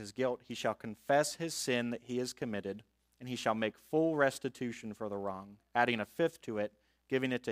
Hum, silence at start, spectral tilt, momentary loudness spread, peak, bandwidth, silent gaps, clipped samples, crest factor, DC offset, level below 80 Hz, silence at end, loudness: none; 0 s; -4.5 dB/octave; 11 LU; -14 dBFS; 15.5 kHz; none; under 0.1%; 22 dB; under 0.1%; -74 dBFS; 0 s; -35 LUFS